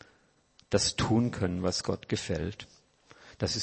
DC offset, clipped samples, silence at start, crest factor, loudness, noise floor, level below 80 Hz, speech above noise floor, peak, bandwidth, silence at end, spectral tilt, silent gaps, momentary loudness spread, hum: under 0.1%; under 0.1%; 0.7 s; 20 dB; -30 LUFS; -66 dBFS; -52 dBFS; 37 dB; -12 dBFS; 8.8 kHz; 0 s; -4.5 dB/octave; none; 10 LU; none